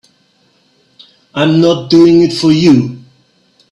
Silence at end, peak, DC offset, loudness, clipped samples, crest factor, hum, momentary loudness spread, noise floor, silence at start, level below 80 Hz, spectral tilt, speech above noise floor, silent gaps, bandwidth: 0.75 s; 0 dBFS; under 0.1%; -9 LUFS; under 0.1%; 12 dB; none; 9 LU; -54 dBFS; 1.35 s; -50 dBFS; -6.5 dB/octave; 46 dB; none; 10.5 kHz